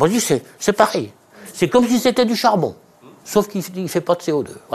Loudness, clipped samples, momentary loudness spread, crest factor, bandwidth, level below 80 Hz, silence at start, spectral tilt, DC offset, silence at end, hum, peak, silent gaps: -18 LUFS; under 0.1%; 9 LU; 18 dB; 13.5 kHz; -56 dBFS; 0 s; -4.5 dB/octave; under 0.1%; 0 s; none; 0 dBFS; none